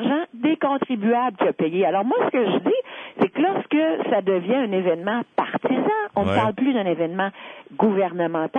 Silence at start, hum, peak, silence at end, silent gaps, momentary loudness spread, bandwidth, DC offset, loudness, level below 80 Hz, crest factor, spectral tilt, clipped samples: 0 s; none; -4 dBFS; 0 s; none; 4 LU; 8.2 kHz; under 0.1%; -22 LUFS; -64 dBFS; 16 dB; -8 dB/octave; under 0.1%